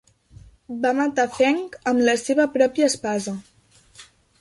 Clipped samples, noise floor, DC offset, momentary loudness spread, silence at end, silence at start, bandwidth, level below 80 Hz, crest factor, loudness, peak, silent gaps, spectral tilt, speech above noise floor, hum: under 0.1%; -55 dBFS; under 0.1%; 9 LU; 0.35 s; 0.7 s; 11.5 kHz; -60 dBFS; 18 dB; -21 LUFS; -4 dBFS; none; -3.5 dB/octave; 34 dB; none